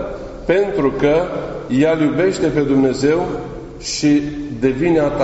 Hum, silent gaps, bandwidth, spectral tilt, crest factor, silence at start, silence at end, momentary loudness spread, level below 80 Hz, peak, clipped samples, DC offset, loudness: none; none; 8.2 kHz; -6 dB/octave; 14 dB; 0 s; 0 s; 11 LU; -38 dBFS; -2 dBFS; under 0.1%; under 0.1%; -17 LUFS